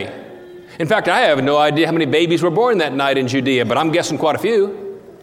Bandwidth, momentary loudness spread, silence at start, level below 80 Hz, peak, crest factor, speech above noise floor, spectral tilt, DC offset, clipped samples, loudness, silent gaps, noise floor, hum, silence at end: 15.5 kHz; 16 LU; 0 s; -62 dBFS; -2 dBFS; 16 dB; 21 dB; -5 dB/octave; under 0.1%; under 0.1%; -16 LUFS; none; -37 dBFS; none; 0.05 s